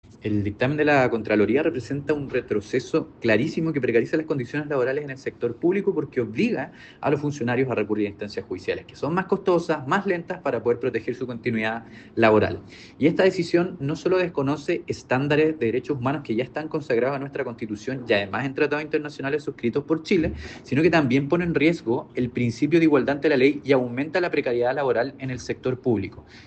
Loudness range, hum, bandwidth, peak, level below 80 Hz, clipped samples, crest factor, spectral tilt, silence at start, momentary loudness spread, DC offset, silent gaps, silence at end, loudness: 4 LU; none; 8.6 kHz; -6 dBFS; -54 dBFS; under 0.1%; 18 dB; -7 dB/octave; 0.1 s; 10 LU; under 0.1%; none; 0.05 s; -24 LUFS